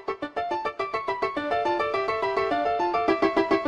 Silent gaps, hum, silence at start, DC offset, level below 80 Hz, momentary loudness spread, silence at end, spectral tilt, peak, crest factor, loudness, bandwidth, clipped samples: none; none; 0 s; under 0.1%; -56 dBFS; 6 LU; 0 s; -5.5 dB/octave; -10 dBFS; 16 dB; -26 LUFS; 10.5 kHz; under 0.1%